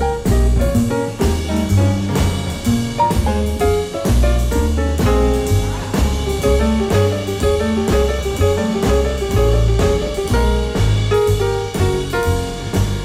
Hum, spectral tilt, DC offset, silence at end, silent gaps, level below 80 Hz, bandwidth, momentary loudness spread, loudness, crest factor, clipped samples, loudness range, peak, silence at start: none; -6 dB/octave; under 0.1%; 0 s; none; -20 dBFS; 16 kHz; 3 LU; -17 LUFS; 12 dB; under 0.1%; 1 LU; -4 dBFS; 0 s